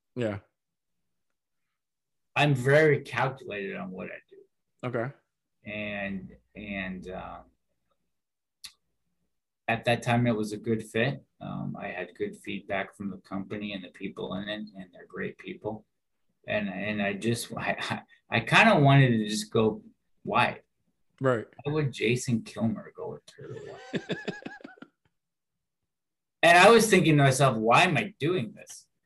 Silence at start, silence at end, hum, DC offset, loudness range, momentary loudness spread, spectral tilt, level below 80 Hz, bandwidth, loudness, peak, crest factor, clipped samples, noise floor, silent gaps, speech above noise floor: 0.15 s; 0.25 s; none; under 0.1%; 15 LU; 21 LU; -5.5 dB/octave; -62 dBFS; 12.5 kHz; -26 LUFS; -6 dBFS; 22 dB; under 0.1%; under -90 dBFS; none; over 63 dB